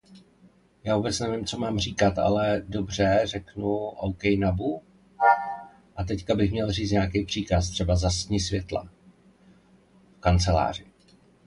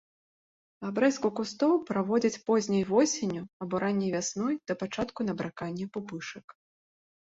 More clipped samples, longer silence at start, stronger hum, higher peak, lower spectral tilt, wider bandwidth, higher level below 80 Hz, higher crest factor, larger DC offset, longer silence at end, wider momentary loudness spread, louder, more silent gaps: neither; second, 0.1 s vs 0.8 s; neither; first, -8 dBFS vs -12 dBFS; about the same, -5.5 dB/octave vs -5 dB/octave; first, 11.5 kHz vs 8 kHz; first, -38 dBFS vs -66 dBFS; about the same, 20 dB vs 18 dB; neither; second, 0.65 s vs 0.85 s; about the same, 9 LU vs 11 LU; first, -26 LUFS vs -30 LUFS; second, none vs 3.53-3.60 s